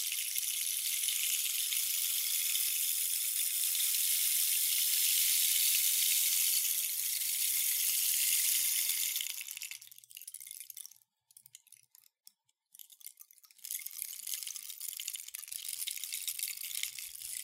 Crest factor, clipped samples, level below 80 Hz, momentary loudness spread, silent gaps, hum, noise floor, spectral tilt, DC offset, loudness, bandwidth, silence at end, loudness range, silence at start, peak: 20 dB; under 0.1%; under -90 dBFS; 18 LU; none; none; -67 dBFS; 7.5 dB/octave; under 0.1%; -30 LUFS; 16.5 kHz; 0 s; 19 LU; 0 s; -14 dBFS